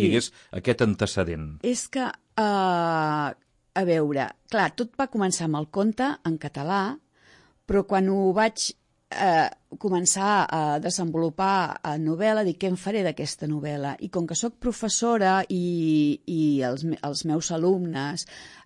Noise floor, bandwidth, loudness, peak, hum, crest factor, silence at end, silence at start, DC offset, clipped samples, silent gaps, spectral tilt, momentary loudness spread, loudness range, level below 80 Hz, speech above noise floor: -57 dBFS; 11.5 kHz; -25 LUFS; -6 dBFS; none; 18 dB; 0.1 s; 0 s; under 0.1%; under 0.1%; none; -4.5 dB/octave; 8 LU; 3 LU; -54 dBFS; 33 dB